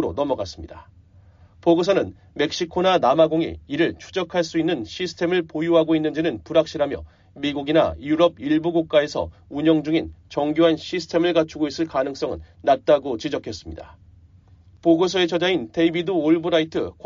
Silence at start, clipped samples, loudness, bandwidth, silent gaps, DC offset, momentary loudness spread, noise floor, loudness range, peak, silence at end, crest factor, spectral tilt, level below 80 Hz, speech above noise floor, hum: 0 s; under 0.1%; -21 LUFS; 7.4 kHz; none; under 0.1%; 11 LU; -51 dBFS; 2 LU; -4 dBFS; 0.15 s; 18 dB; -4 dB/octave; -50 dBFS; 30 dB; none